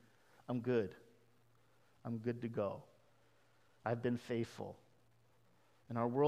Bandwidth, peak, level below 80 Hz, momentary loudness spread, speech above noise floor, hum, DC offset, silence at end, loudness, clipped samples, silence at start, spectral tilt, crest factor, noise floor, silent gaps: 13 kHz; -20 dBFS; -80 dBFS; 14 LU; 34 dB; none; under 0.1%; 0 s; -41 LUFS; under 0.1%; 0.5 s; -8 dB/octave; 22 dB; -73 dBFS; none